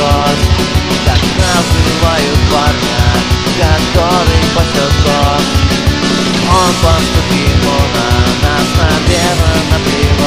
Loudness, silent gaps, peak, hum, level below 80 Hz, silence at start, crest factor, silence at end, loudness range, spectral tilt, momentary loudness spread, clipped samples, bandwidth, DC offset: -10 LUFS; none; 0 dBFS; none; -18 dBFS; 0 s; 10 dB; 0 s; 0 LU; -4.5 dB/octave; 2 LU; 0.2%; 16 kHz; 2%